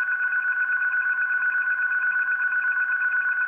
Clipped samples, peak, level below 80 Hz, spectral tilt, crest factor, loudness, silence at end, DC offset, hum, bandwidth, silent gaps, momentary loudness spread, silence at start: under 0.1%; -16 dBFS; -82 dBFS; -2 dB/octave; 8 dB; -22 LUFS; 0 s; under 0.1%; none; 3.4 kHz; none; 1 LU; 0 s